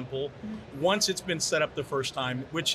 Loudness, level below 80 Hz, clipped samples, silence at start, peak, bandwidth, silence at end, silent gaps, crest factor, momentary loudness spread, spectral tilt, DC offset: -29 LUFS; -60 dBFS; under 0.1%; 0 s; -14 dBFS; 14 kHz; 0 s; none; 16 dB; 11 LU; -3 dB/octave; under 0.1%